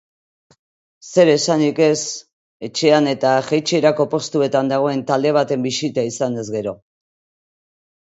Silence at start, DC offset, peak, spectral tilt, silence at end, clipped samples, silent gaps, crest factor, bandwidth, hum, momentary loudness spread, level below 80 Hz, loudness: 1.05 s; under 0.1%; 0 dBFS; -4.5 dB/octave; 1.25 s; under 0.1%; 2.33-2.60 s; 18 dB; 8 kHz; none; 11 LU; -66 dBFS; -18 LUFS